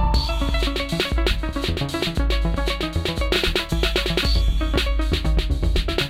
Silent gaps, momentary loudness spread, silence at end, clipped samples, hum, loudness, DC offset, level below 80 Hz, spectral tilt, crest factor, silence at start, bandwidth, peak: none; 3 LU; 0 s; under 0.1%; none; -22 LUFS; under 0.1%; -22 dBFS; -5 dB/octave; 16 dB; 0 s; 15.5 kHz; -6 dBFS